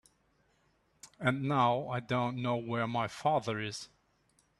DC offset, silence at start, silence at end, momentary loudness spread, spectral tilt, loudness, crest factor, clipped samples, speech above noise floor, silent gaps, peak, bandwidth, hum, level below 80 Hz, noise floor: under 0.1%; 1.05 s; 0.75 s; 9 LU; -6 dB/octave; -33 LUFS; 22 dB; under 0.1%; 40 dB; none; -12 dBFS; 12 kHz; none; -70 dBFS; -72 dBFS